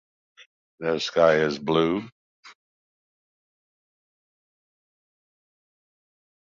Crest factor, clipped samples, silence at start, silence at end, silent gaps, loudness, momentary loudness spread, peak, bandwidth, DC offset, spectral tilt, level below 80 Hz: 24 dB; under 0.1%; 0.8 s; 4.05 s; 2.12-2.43 s; -23 LUFS; 12 LU; -6 dBFS; 7.6 kHz; under 0.1%; -5.5 dB/octave; -64 dBFS